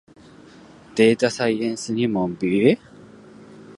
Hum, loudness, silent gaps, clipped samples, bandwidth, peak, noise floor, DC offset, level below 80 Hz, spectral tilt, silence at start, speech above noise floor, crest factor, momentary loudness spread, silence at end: none; -21 LUFS; none; under 0.1%; 11.5 kHz; -2 dBFS; -46 dBFS; under 0.1%; -60 dBFS; -5.5 dB/octave; 0.95 s; 27 dB; 20 dB; 8 LU; 0.05 s